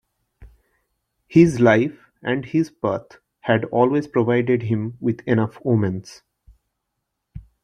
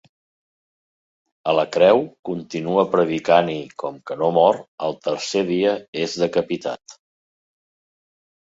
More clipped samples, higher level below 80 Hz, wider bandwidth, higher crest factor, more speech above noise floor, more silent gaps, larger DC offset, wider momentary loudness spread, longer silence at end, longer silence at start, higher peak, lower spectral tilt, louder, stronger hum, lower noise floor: neither; first, -54 dBFS vs -64 dBFS; first, 10 kHz vs 7.8 kHz; about the same, 20 dB vs 20 dB; second, 59 dB vs over 70 dB; second, none vs 2.19-2.23 s, 4.68-4.78 s, 5.88-5.93 s; neither; second, 10 LU vs 13 LU; second, 0.25 s vs 1.55 s; second, 0.4 s vs 1.45 s; about the same, -2 dBFS vs -2 dBFS; first, -8 dB/octave vs -5 dB/octave; about the same, -20 LUFS vs -20 LUFS; neither; second, -78 dBFS vs under -90 dBFS